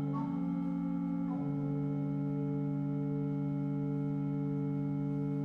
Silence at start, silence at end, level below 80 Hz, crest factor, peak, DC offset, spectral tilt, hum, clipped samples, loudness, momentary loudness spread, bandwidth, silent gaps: 0 s; 0 s; -62 dBFS; 10 dB; -24 dBFS; under 0.1%; -11.5 dB/octave; none; under 0.1%; -35 LUFS; 0 LU; 3.7 kHz; none